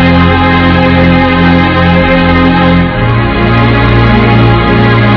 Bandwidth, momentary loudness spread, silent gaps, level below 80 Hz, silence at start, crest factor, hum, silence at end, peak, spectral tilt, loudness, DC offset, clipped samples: 5.4 kHz; 2 LU; none; -18 dBFS; 0 s; 6 dB; none; 0 s; 0 dBFS; -9 dB/octave; -7 LUFS; under 0.1%; 6%